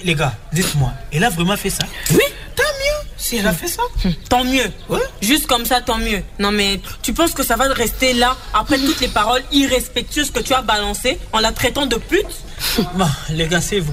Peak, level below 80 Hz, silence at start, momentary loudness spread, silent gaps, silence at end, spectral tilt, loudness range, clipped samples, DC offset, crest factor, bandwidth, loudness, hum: -2 dBFS; -30 dBFS; 0 s; 5 LU; none; 0 s; -3.5 dB/octave; 2 LU; under 0.1%; under 0.1%; 16 dB; 16 kHz; -17 LUFS; none